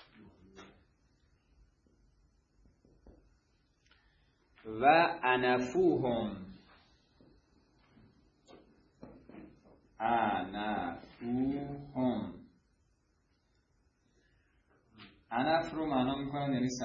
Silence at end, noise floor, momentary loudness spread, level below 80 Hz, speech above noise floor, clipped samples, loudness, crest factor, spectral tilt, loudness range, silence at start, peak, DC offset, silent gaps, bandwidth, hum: 0 s; -74 dBFS; 22 LU; -64 dBFS; 43 dB; under 0.1%; -32 LUFS; 24 dB; -4 dB/octave; 12 LU; 0.25 s; -12 dBFS; under 0.1%; none; 7.2 kHz; none